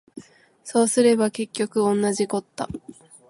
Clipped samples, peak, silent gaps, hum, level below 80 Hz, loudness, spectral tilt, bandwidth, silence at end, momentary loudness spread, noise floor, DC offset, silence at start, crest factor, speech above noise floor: under 0.1%; -6 dBFS; none; none; -60 dBFS; -22 LUFS; -4.5 dB/octave; 11.5 kHz; 0.35 s; 15 LU; -45 dBFS; under 0.1%; 0.15 s; 18 dB; 23 dB